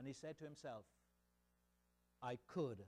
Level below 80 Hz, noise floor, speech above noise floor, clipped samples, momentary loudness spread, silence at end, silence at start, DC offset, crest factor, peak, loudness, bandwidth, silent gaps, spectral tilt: -82 dBFS; -82 dBFS; 32 dB; under 0.1%; 8 LU; 0 s; 0 s; under 0.1%; 18 dB; -34 dBFS; -52 LUFS; 14.5 kHz; none; -6.5 dB/octave